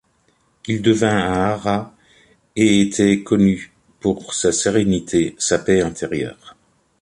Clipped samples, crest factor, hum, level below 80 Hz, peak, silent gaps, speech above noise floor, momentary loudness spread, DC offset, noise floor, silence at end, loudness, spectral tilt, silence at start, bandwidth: under 0.1%; 16 dB; none; -46 dBFS; -2 dBFS; none; 44 dB; 10 LU; under 0.1%; -61 dBFS; 0.5 s; -18 LUFS; -5 dB/octave; 0.65 s; 11.5 kHz